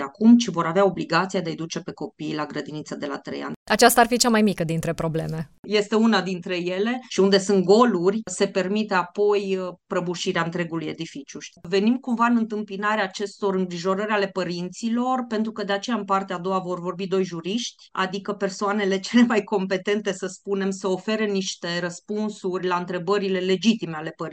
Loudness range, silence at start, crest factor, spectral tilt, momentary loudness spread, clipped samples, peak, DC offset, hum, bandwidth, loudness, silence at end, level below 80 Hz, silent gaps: 5 LU; 0 s; 22 dB; -4.5 dB/octave; 13 LU; under 0.1%; -2 dBFS; under 0.1%; none; 16 kHz; -23 LUFS; 0 s; -60 dBFS; 3.56-3.66 s, 5.59-5.63 s